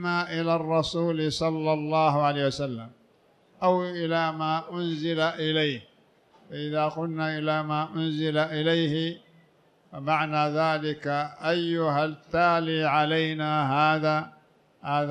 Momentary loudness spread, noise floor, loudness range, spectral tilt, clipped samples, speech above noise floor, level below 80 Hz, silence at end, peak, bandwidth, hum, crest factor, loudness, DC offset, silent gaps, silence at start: 8 LU; -62 dBFS; 4 LU; -6 dB/octave; under 0.1%; 36 dB; -62 dBFS; 0 s; -10 dBFS; 10 kHz; none; 16 dB; -26 LUFS; under 0.1%; none; 0 s